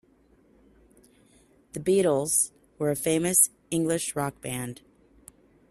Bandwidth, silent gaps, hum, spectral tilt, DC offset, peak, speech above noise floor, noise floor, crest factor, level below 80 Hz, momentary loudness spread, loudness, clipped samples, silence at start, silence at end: 15.5 kHz; none; none; -4 dB/octave; under 0.1%; -6 dBFS; 36 dB; -61 dBFS; 22 dB; -62 dBFS; 14 LU; -25 LUFS; under 0.1%; 1.75 s; 0.95 s